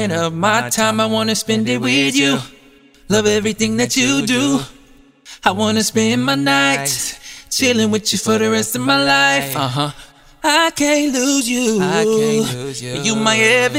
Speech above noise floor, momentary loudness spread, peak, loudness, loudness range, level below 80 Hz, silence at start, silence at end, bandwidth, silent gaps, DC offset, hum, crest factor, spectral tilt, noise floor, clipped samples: 31 dB; 8 LU; 0 dBFS; -15 LUFS; 2 LU; -48 dBFS; 0 s; 0 s; 16 kHz; none; under 0.1%; none; 16 dB; -3 dB/octave; -47 dBFS; under 0.1%